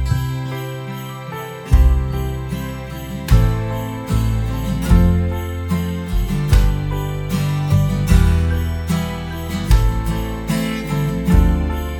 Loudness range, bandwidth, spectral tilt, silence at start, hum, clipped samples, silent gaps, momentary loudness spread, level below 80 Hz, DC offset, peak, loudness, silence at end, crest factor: 2 LU; 17.5 kHz; -7 dB/octave; 0 s; none; under 0.1%; none; 12 LU; -20 dBFS; under 0.1%; 0 dBFS; -19 LUFS; 0 s; 16 dB